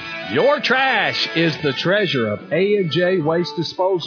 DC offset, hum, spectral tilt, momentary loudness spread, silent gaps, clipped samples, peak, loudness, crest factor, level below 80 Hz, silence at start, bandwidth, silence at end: under 0.1%; none; -5.5 dB/octave; 6 LU; none; under 0.1%; -4 dBFS; -18 LUFS; 14 dB; -64 dBFS; 0 s; 5.4 kHz; 0 s